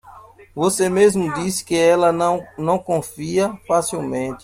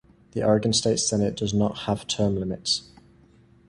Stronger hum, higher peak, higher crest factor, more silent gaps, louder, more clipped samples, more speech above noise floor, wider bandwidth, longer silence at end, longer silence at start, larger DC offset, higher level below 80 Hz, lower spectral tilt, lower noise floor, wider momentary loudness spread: neither; about the same, -4 dBFS vs -6 dBFS; about the same, 16 dB vs 18 dB; neither; first, -19 LUFS vs -24 LUFS; neither; second, 25 dB vs 31 dB; first, 16 kHz vs 11.5 kHz; second, 0.05 s vs 0.85 s; second, 0.05 s vs 0.35 s; neither; about the same, -54 dBFS vs -50 dBFS; about the same, -5 dB/octave vs -4.5 dB/octave; second, -44 dBFS vs -55 dBFS; first, 9 LU vs 6 LU